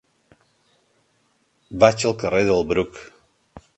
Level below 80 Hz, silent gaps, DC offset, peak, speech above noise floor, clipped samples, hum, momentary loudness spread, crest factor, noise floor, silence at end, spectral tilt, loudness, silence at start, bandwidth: -50 dBFS; none; under 0.1%; 0 dBFS; 46 dB; under 0.1%; none; 17 LU; 24 dB; -65 dBFS; 0.2 s; -5 dB/octave; -20 LUFS; 1.7 s; 8.8 kHz